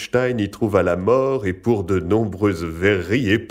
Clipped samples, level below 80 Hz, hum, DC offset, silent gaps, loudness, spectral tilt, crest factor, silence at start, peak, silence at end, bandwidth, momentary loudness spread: under 0.1%; -46 dBFS; none; under 0.1%; none; -20 LUFS; -7 dB/octave; 16 dB; 0 s; -4 dBFS; 0 s; 16 kHz; 4 LU